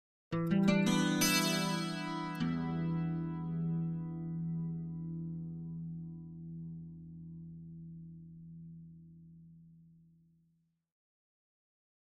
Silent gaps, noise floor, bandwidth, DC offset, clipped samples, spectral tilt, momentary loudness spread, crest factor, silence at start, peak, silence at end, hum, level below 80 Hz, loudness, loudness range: none; -76 dBFS; 14 kHz; under 0.1%; under 0.1%; -5 dB/octave; 22 LU; 20 dB; 0.3 s; -16 dBFS; 2.15 s; none; -64 dBFS; -35 LUFS; 22 LU